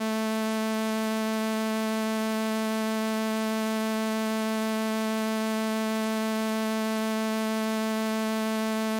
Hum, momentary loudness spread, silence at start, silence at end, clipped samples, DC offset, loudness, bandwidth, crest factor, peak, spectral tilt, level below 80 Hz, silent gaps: none; 0 LU; 0 s; 0 s; under 0.1%; under 0.1%; -28 LUFS; 17 kHz; 12 dB; -16 dBFS; -4.5 dB/octave; -72 dBFS; none